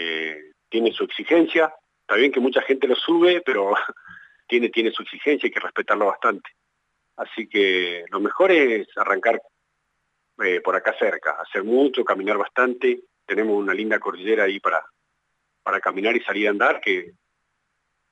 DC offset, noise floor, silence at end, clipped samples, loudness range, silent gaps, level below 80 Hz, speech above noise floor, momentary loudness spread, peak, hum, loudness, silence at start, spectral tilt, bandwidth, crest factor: under 0.1%; -74 dBFS; 1 s; under 0.1%; 4 LU; none; -80 dBFS; 53 dB; 9 LU; -6 dBFS; none; -21 LUFS; 0 s; -5 dB/octave; 8 kHz; 16 dB